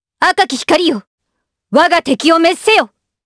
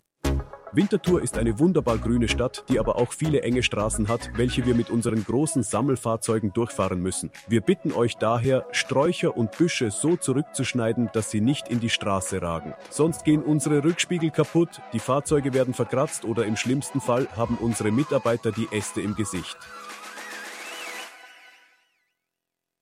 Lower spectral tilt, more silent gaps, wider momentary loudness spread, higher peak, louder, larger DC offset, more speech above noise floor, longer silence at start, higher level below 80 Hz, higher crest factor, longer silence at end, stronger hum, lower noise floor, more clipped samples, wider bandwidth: second, -3 dB/octave vs -5.5 dB/octave; first, 1.07-1.18 s vs none; second, 6 LU vs 9 LU; first, 0 dBFS vs -8 dBFS; first, -12 LUFS vs -24 LUFS; neither; about the same, 62 dB vs 61 dB; about the same, 0.2 s vs 0.25 s; second, -54 dBFS vs -42 dBFS; about the same, 14 dB vs 16 dB; second, 0.4 s vs 1.55 s; neither; second, -73 dBFS vs -85 dBFS; neither; second, 11 kHz vs 16 kHz